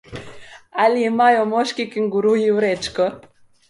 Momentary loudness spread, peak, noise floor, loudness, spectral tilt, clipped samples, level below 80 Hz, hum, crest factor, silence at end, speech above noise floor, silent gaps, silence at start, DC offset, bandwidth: 9 LU; -2 dBFS; -39 dBFS; -18 LUFS; -5 dB/octave; under 0.1%; -56 dBFS; none; 16 dB; 0.5 s; 21 dB; none; 0.1 s; under 0.1%; 11.5 kHz